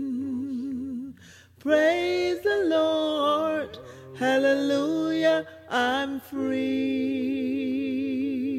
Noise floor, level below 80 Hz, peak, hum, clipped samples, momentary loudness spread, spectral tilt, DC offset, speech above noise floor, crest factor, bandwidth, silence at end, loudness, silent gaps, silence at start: -51 dBFS; -66 dBFS; -10 dBFS; none; under 0.1%; 10 LU; -5 dB/octave; under 0.1%; 26 dB; 14 dB; 14.5 kHz; 0 s; -26 LUFS; none; 0 s